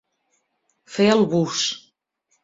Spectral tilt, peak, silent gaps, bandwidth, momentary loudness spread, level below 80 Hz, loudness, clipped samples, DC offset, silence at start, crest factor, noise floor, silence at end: -4.5 dB/octave; -4 dBFS; none; 7.8 kHz; 15 LU; -64 dBFS; -20 LUFS; under 0.1%; under 0.1%; 0.9 s; 20 dB; -71 dBFS; 0.65 s